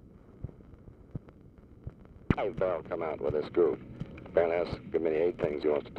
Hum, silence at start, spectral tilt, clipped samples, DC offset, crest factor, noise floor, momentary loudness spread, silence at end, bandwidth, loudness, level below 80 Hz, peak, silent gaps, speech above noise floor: none; 0.05 s; -9 dB/octave; under 0.1%; under 0.1%; 22 dB; -54 dBFS; 18 LU; 0 s; 6 kHz; -31 LUFS; -52 dBFS; -10 dBFS; none; 24 dB